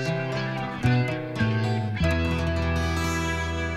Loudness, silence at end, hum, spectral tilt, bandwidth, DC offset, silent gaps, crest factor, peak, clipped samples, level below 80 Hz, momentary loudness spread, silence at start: -26 LUFS; 0 s; none; -6 dB/octave; 14 kHz; 0.2%; none; 16 dB; -10 dBFS; under 0.1%; -36 dBFS; 4 LU; 0 s